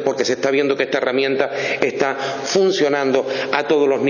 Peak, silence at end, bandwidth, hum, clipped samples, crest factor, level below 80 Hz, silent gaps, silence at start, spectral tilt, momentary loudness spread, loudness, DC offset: 0 dBFS; 0 s; 7.2 kHz; none; under 0.1%; 18 dB; -68 dBFS; none; 0 s; -4 dB/octave; 4 LU; -18 LUFS; under 0.1%